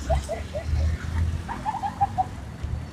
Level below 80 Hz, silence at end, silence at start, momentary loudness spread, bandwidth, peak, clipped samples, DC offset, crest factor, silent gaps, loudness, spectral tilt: -32 dBFS; 0 s; 0 s; 7 LU; 12 kHz; -10 dBFS; under 0.1%; under 0.1%; 16 dB; none; -29 LUFS; -6.5 dB/octave